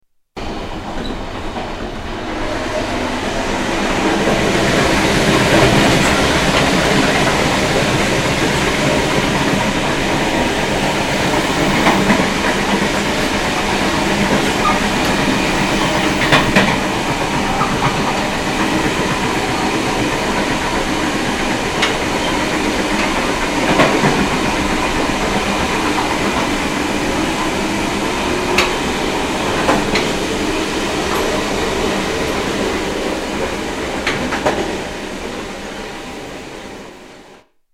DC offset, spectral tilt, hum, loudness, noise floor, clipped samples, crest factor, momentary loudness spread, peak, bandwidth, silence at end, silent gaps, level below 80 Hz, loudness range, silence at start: under 0.1%; -4 dB/octave; none; -16 LUFS; -45 dBFS; under 0.1%; 14 dB; 12 LU; -2 dBFS; 16.5 kHz; 0.4 s; none; -30 dBFS; 7 LU; 0.35 s